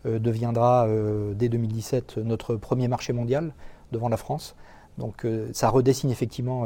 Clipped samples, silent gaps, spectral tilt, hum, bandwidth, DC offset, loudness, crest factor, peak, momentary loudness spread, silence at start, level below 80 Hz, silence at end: under 0.1%; none; -7 dB/octave; none; 17 kHz; under 0.1%; -26 LUFS; 18 dB; -8 dBFS; 12 LU; 0.05 s; -48 dBFS; 0 s